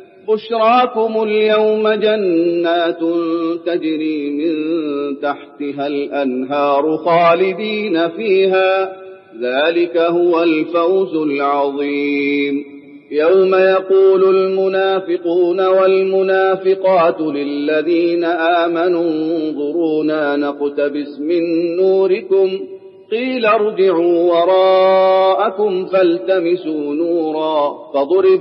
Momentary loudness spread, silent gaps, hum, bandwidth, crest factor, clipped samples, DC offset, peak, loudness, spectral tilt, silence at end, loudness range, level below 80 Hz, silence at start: 8 LU; none; none; 5.8 kHz; 12 dB; under 0.1%; under 0.1%; -2 dBFS; -15 LUFS; -10 dB/octave; 0 s; 4 LU; -76 dBFS; 0 s